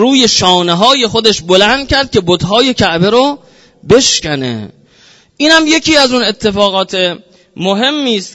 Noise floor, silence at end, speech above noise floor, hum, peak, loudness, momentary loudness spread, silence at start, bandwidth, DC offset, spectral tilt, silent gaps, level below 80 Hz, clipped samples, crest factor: -45 dBFS; 0.05 s; 34 dB; none; 0 dBFS; -10 LUFS; 8 LU; 0 s; 11 kHz; under 0.1%; -3.5 dB/octave; none; -38 dBFS; 0.5%; 10 dB